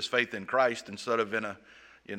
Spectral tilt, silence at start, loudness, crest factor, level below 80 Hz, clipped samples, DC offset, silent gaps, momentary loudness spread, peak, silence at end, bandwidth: -3.5 dB/octave; 0 s; -30 LUFS; 22 dB; -74 dBFS; under 0.1%; under 0.1%; none; 11 LU; -10 dBFS; 0 s; 16 kHz